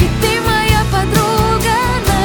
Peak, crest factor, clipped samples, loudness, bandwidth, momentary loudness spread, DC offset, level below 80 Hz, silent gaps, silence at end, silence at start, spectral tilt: 0 dBFS; 12 dB; under 0.1%; -13 LUFS; over 20 kHz; 2 LU; under 0.1%; -22 dBFS; none; 0 s; 0 s; -4.5 dB/octave